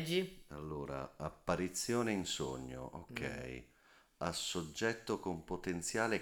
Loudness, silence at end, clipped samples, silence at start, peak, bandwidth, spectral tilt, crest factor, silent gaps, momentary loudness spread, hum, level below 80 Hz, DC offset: -40 LUFS; 0 s; under 0.1%; 0 s; -20 dBFS; over 20 kHz; -4 dB/octave; 20 dB; none; 11 LU; none; -60 dBFS; under 0.1%